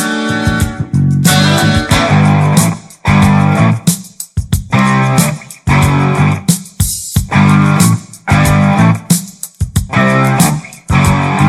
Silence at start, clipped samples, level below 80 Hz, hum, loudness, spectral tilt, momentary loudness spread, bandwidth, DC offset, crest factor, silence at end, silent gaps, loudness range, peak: 0 s; under 0.1%; -28 dBFS; none; -11 LUFS; -5 dB/octave; 8 LU; 15.5 kHz; under 0.1%; 10 dB; 0 s; none; 2 LU; 0 dBFS